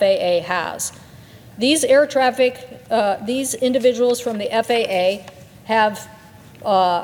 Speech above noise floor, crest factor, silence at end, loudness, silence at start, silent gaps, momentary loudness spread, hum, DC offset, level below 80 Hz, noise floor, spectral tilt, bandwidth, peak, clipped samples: 24 dB; 16 dB; 0 s; -19 LUFS; 0 s; none; 12 LU; none; under 0.1%; -60 dBFS; -42 dBFS; -3 dB/octave; 18.5 kHz; -4 dBFS; under 0.1%